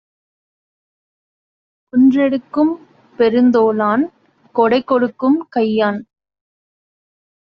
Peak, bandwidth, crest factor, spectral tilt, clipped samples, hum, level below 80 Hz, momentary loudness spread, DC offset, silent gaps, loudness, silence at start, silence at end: -2 dBFS; 5.8 kHz; 16 dB; -4.5 dB/octave; under 0.1%; none; -62 dBFS; 8 LU; under 0.1%; none; -15 LUFS; 1.95 s; 1.5 s